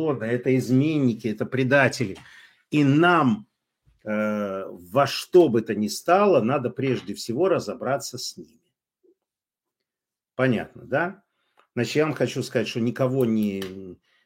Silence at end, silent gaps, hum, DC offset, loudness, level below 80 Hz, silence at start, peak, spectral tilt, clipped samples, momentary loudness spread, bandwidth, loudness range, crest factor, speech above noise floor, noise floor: 0.3 s; none; none; under 0.1%; -23 LUFS; -68 dBFS; 0 s; -4 dBFS; -6 dB/octave; under 0.1%; 13 LU; 16.5 kHz; 8 LU; 20 dB; 67 dB; -89 dBFS